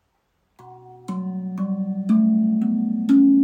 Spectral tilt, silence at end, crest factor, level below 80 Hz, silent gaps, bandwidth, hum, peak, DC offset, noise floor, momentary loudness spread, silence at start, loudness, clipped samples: -9.5 dB/octave; 0 s; 14 dB; -70 dBFS; none; 4 kHz; none; -8 dBFS; under 0.1%; -69 dBFS; 13 LU; 0.65 s; -21 LUFS; under 0.1%